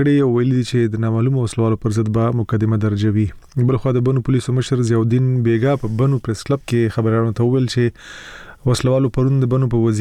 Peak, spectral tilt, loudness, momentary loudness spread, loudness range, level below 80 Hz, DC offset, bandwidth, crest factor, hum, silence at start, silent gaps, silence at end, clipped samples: -8 dBFS; -7.5 dB/octave; -18 LUFS; 5 LU; 1 LU; -42 dBFS; under 0.1%; 11.5 kHz; 8 dB; none; 0 s; none; 0 s; under 0.1%